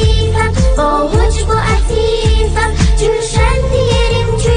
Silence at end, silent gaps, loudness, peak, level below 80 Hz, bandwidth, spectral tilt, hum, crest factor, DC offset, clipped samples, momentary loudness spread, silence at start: 0 s; none; -13 LUFS; 0 dBFS; -14 dBFS; 10 kHz; -5 dB/octave; none; 10 dB; under 0.1%; under 0.1%; 1 LU; 0 s